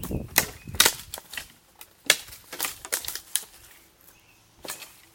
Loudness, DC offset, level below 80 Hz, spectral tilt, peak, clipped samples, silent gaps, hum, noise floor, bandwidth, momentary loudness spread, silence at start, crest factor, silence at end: -26 LUFS; under 0.1%; -50 dBFS; -0.5 dB/octave; 0 dBFS; under 0.1%; none; none; -57 dBFS; 17 kHz; 19 LU; 0 s; 30 dB; 0.25 s